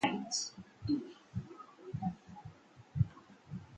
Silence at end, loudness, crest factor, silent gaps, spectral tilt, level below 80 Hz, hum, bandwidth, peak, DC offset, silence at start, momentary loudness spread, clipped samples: 0 s; -40 LUFS; 22 dB; none; -4.5 dB/octave; -58 dBFS; none; 9.4 kHz; -18 dBFS; under 0.1%; 0 s; 17 LU; under 0.1%